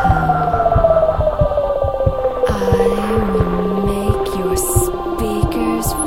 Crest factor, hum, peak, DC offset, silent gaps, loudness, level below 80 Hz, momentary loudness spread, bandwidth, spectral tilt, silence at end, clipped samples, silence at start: 16 dB; none; 0 dBFS; 1%; none; -16 LUFS; -26 dBFS; 4 LU; 16 kHz; -6 dB/octave; 0 s; under 0.1%; 0 s